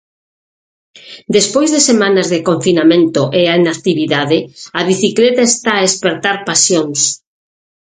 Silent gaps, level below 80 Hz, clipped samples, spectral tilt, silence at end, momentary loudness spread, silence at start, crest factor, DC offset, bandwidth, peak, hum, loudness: none; -56 dBFS; under 0.1%; -3.5 dB/octave; 0.65 s; 6 LU; 0.95 s; 14 dB; under 0.1%; 9.6 kHz; 0 dBFS; none; -12 LUFS